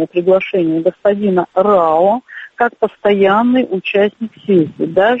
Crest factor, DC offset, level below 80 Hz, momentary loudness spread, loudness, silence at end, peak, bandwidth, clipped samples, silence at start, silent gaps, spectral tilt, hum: 12 dB; under 0.1%; -56 dBFS; 6 LU; -14 LUFS; 0 s; 0 dBFS; 5.6 kHz; under 0.1%; 0 s; none; -8.5 dB/octave; none